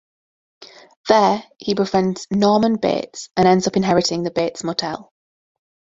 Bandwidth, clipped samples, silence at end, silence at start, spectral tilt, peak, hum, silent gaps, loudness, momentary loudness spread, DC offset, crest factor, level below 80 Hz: 7.8 kHz; under 0.1%; 0.95 s; 0.6 s; -5 dB/octave; 0 dBFS; none; 0.97-1.04 s; -18 LUFS; 9 LU; under 0.1%; 20 dB; -56 dBFS